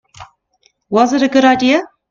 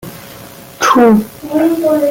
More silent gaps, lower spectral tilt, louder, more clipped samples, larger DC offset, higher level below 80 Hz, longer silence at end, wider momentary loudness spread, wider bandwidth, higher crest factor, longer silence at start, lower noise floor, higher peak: neither; about the same, -4 dB/octave vs -5 dB/octave; about the same, -13 LUFS vs -11 LUFS; neither; neither; about the same, -54 dBFS vs -50 dBFS; first, 0.25 s vs 0 s; second, 6 LU vs 23 LU; second, 7.4 kHz vs 17 kHz; about the same, 14 dB vs 12 dB; first, 0.2 s vs 0.05 s; first, -59 dBFS vs -33 dBFS; about the same, 0 dBFS vs -2 dBFS